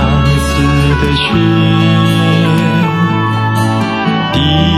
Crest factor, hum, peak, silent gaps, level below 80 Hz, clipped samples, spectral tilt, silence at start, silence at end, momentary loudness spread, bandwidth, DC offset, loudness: 10 dB; none; 0 dBFS; none; -22 dBFS; under 0.1%; -6.5 dB/octave; 0 s; 0 s; 3 LU; 14 kHz; under 0.1%; -11 LUFS